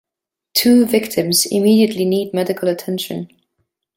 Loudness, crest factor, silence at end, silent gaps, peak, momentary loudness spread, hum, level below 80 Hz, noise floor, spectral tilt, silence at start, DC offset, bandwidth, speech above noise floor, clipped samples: -16 LUFS; 16 dB; 0.7 s; none; -2 dBFS; 11 LU; none; -60 dBFS; -85 dBFS; -4 dB/octave; 0.55 s; under 0.1%; 17 kHz; 69 dB; under 0.1%